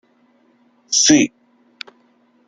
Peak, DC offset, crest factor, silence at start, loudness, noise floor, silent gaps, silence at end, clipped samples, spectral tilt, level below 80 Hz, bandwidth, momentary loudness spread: 0 dBFS; under 0.1%; 20 dB; 0.9 s; -14 LUFS; -57 dBFS; none; 1.2 s; under 0.1%; -2 dB/octave; -60 dBFS; 9.4 kHz; 25 LU